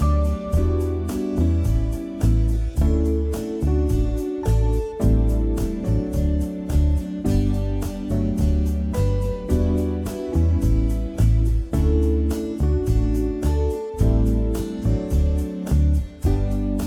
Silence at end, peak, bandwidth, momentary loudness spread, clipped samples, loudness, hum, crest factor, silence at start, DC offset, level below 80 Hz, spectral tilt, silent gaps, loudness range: 0 s; -6 dBFS; 15 kHz; 5 LU; under 0.1%; -22 LUFS; none; 14 dB; 0 s; under 0.1%; -22 dBFS; -8.5 dB/octave; none; 1 LU